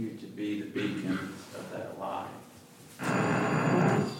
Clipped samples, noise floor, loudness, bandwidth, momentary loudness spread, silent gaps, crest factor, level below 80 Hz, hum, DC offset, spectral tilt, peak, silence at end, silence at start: under 0.1%; -52 dBFS; -31 LUFS; 16.5 kHz; 19 LU; none; 16 dB; -72 dBFS; none; under 0.1%; -6.5 dB/octave; -16 dBFS; 0 s; 0 s